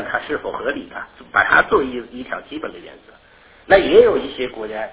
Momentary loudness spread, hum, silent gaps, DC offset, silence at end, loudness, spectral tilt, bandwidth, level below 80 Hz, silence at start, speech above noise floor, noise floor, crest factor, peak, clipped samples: 18 LU; none; none; under 0.1%; 0 s; -17 LUFS; -8 dB/octave; 4 kHz; -46 dBFS; 0 s; 30 dB; -49 dBFS; 18 dB; 0 dBFS; under 0.1%